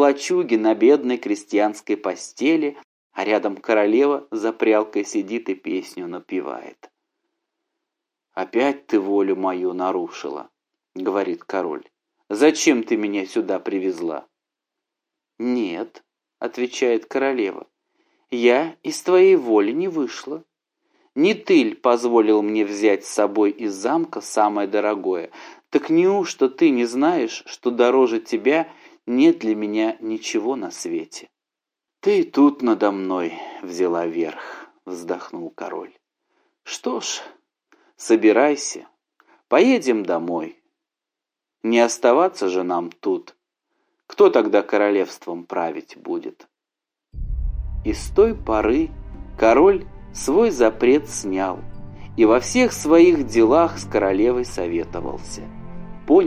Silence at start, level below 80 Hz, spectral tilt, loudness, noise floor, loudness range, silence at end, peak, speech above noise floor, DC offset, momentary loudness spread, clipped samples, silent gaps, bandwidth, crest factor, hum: 0 s; -42 dBFS; -4.5 dB/octave; -20 LUFS; -87 dBFS; 8 LU; 0 s; -2 dBFS; 67 dB; under 0.1%; 16 LU; under 0.1%; 2.84-3.10 s; 14.5 kHz; 18 dB; none